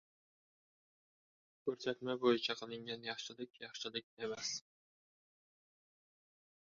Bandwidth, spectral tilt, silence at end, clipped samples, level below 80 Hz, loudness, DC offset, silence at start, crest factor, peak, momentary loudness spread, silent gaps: 7.2 kHz; -2 dB/octave; 2.15 s; under 0.1%; -86 dBFS; -41 LUFS; under 0.1%; 1.65 s; 26 dB; -18 dBFS; 12 LU; 3.50-3.54 s, 4.04-4.17 s